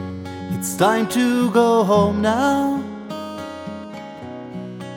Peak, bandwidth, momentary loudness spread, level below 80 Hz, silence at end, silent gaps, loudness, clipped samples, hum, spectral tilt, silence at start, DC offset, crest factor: -4 dBFS; 18 kHz; 17 LU; -52 dBFS; 0 s; none; -18 LUFS; under 0.1%; none; -5.5 dB/octave; 0 s; under 0.1%; 16 dB